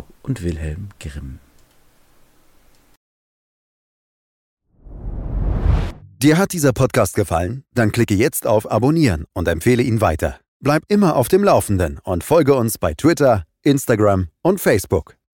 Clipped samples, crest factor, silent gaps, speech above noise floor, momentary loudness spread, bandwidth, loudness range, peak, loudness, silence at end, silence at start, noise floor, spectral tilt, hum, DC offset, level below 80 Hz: under 0.1%; 16 dB; 2.97-4.57 s, 10.48-10.60 s; 36 dB; 13 LU; 17 kHz; 14 LU; -4 dBFS; -18 LUFS; 0.3 s; 0.25 s; -53 dBFS; -6 dB/octave; none; under 0.1%; -32 dBFS